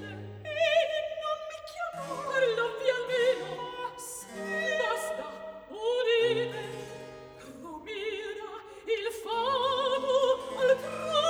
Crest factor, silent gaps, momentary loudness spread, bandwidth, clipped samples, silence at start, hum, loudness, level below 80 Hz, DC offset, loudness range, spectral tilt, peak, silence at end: 18 dB; none; 16 LU; over 20 kHz; under 0.1%; 0 s; none; -30 LUFS; -68 dBFS; under 0.1%; 3 LU; -3 dB/octave; -14 dBFS; 0 s